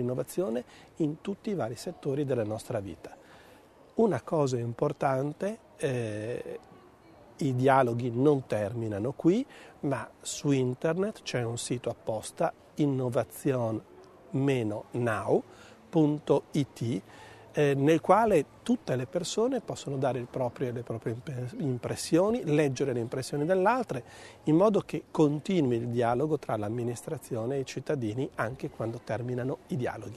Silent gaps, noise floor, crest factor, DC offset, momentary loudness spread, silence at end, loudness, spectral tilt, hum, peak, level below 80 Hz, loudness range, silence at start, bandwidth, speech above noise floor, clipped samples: none; -56 dBFS; 22 dB; under 0.1%; 11 LU; 0 s; -30 LUFS; -6.5 dB/octave; none; -8 dBFS; -64 dBFS; 5 LU; 0 s; 13.5 kHz; 27 dB; under 0.1%